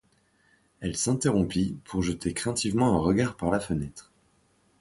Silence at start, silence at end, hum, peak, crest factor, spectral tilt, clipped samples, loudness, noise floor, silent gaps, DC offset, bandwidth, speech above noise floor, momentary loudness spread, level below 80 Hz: 0.8 s; 0.8 s; none; -10 dBFS; 18 dB; -5.5 dB/octave; under 0.1%; -27 LUFS; -66 dBFS; none; under 0.1%; 11.5 kHz; 39 dB; 8 LU; -48 dBFS